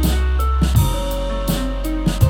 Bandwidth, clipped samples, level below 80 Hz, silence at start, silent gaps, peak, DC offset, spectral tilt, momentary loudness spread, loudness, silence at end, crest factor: 18.5 kHz; under 0.1%; -20 dBFS; 0 s; none; -2 dBFS; under 0.1%; -6 dB/octave; 6 LU; -20 LUFS; 0 s; 16 dB